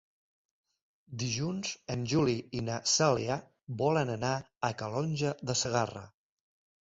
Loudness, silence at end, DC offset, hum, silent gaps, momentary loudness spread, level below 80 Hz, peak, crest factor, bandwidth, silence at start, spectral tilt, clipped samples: -32 LUFS; 0.75 s; under 0.1%; none; 4.57-4.61 s; 10 LU; -62 dBFS; -12 dBFS; 20 dB; 7.8 kHz; 1.1 s; -4.5 dB/octave; under 0.1%